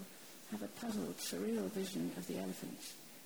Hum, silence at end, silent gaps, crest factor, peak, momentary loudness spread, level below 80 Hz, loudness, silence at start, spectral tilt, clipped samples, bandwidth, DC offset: none; 0 s; none; 14 dB; -28 dBFS; 10 LU; -76 dBFS; -43 LUFS; 0 s; -4.5 dB/octave; under 0.1%; over 20 kHz; under 0.1%